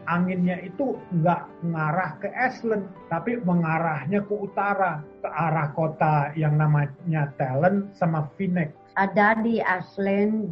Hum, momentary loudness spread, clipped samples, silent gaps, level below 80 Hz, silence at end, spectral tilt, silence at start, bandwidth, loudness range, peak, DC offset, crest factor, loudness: none; 7 LU; under 0.1%; none; -62 dBFS; 0 s; -10 dB/octave; 0 s; 6 kHz; 2 LU; -6 dBFS; under 0.1%; 18 dB; -25 LUFS